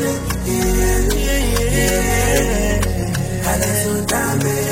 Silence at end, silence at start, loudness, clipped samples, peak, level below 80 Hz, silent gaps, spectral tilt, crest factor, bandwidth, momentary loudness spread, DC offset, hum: 0 s; 0 s; -17 LUFS; under 0.1%; -4 dBFS; -22 dBFS; none; -4.5 dB/octave; 14 dB; 16.5 kHz; 4 LU; under 0.1%; none